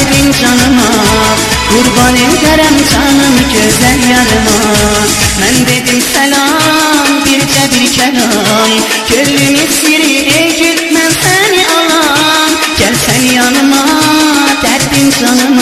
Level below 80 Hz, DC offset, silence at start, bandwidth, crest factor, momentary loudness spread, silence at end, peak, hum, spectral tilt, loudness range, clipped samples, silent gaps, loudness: -26 dBFS; under 0.1%; 0 s; 16.5 kHz; 8 dB; 2 LU; 0 s; 0 dBFS; none; -3 dB/octave; 1 LU; 0.3%; none; -7 LUFS